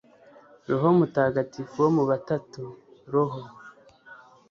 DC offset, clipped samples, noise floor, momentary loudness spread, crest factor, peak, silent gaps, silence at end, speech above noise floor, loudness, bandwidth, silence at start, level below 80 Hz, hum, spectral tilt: under 0.1%; under 0.1%; -53 dBFS; 19 LU; 18 dB; -8 dBFS; none; 0.35 s; 29 dB; -25 LUFS; 7 kHz; 0.7 s; -66 dBFS; none; -8.5 dB/octave